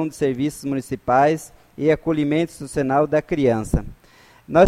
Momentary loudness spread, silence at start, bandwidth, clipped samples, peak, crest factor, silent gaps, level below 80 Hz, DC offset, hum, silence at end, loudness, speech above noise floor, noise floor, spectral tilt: 9 LU; 0 s; 15 kHz; under 0.1%; -2 dBFS; 18 dB; none; -38 dBFS; under 0.1%; none; 0 s; -21 LUFS; 31 dB; -51 dBFS; -6.5 dB/octave